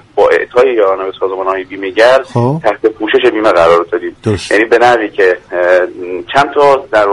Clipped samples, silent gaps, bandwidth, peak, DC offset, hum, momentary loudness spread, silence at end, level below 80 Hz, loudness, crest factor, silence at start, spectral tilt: 0.3%; none; 11.5 kHz; 0 dBFS; under 0.1%; none; 8 LU; 0 s; -46 dBFS; -11 LUFS; 10 dB; 0.15 s; -5.5 dB/octave